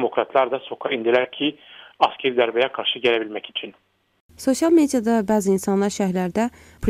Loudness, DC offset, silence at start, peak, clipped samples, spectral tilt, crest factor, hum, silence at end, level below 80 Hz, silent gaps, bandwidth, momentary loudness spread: -21 LUFS; under 0.1%; 0 s; -2 dBFS; under 0.1%; -4.5 dB/octave; 18 dB; none; 0 s; -52 dBFS; 4.20-4.29 s; 15.5 kHz; 10 LU